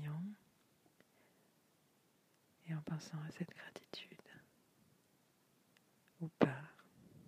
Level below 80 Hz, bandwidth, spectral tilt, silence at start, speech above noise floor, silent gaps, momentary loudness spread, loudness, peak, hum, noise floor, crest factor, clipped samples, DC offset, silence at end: -82 dBFS; 15.5 kHz; -7 dB/octave; 0 s; 27 dB; none; 24 LU; -44 LUFS; -14 dBFS; none; -75 dBFS; 34 dB; under 0.1%; under 0.1%; 0 s